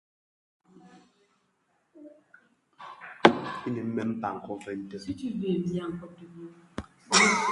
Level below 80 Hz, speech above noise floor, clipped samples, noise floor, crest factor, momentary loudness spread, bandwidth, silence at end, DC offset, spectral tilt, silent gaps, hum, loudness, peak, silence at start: -62 dBFS; 39 dB; under 0.1%; -72 dBFS; 30 dB; 25 LU; 11.5 kHz; 0 s; under 0.1%; -3.5 dB/octave; none; none; -27 LUFS; 0 dBFS; 0.95 s